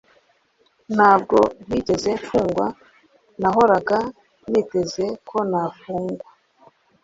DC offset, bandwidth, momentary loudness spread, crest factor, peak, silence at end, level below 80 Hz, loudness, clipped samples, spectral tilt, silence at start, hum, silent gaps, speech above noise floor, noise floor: under 0.1%; 8 kHz; 12 LU; 20 dB; -2 dBFS; 0.85 s; -52 dBFS; -20 LUFS; under 0.1%; -6 dB/octave; 0.9 s; none; none; 43 dB; -62 dBFS